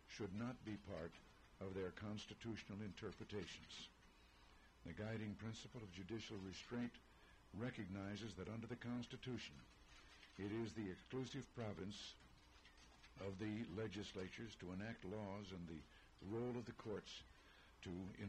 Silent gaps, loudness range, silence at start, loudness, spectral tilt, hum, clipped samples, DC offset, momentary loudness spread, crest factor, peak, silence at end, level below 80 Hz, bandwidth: none; 2 LU; 0 s; -52 LUFS; -6 dB/octave; none; under 0.1%; under 0.1%; 17 LU; 14 dB; -38 dBFS; 0 s; -70 dBFS; 12.5 kHz